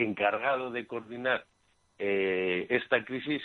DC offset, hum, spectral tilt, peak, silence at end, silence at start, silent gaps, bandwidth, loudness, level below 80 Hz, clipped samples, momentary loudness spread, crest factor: under 0.1%; none; -7 dB/octave; -10 dBFS; 0 s; 0 s; none; 6.4 kHz; -30 LUFS; -72 dBFS; under 0.1%; 8 LU; 22 dB